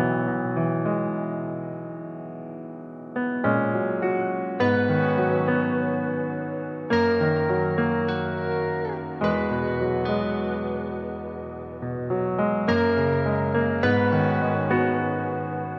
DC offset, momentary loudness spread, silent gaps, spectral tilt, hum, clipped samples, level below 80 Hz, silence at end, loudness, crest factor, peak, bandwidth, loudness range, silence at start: under 0.1%; 12 LU; none; -9 dB/octave; none; under 0.1%; -54 dBFS; 0 s; -25 LUFS; 16 dB; -8 dBFS; 6.4 kHz; 5 LU; 0 s